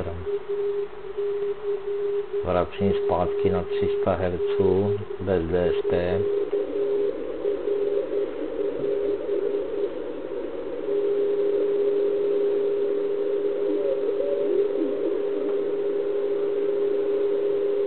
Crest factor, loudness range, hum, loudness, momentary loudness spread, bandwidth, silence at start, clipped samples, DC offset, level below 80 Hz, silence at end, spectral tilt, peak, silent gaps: 16 dB; 3 LU; none; -25 LUFS; 6 LU; 4.3 kHz; 0 s; under 0.1%; 1%; -52 dBFS; 0 s; -11.5 dB/octave; -8 dBFS; none